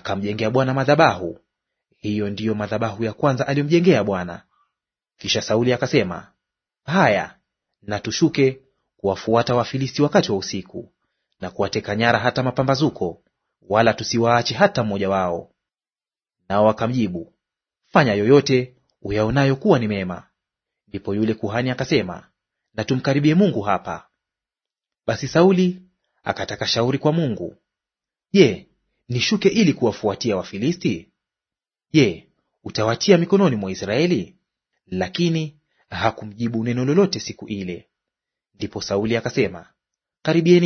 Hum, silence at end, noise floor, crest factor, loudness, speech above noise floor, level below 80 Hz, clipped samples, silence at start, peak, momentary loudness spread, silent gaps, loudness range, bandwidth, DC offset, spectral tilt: none; 0 s; under -90 dBFS; 20 dB; -20 LUFS; over 71 dB; -54 dBFS; under 0.1%; 0.05 s; 0 dBFS; 16 LU; none; 4 LU; 6.6 kHz; under 0.1%; -6 dB/octave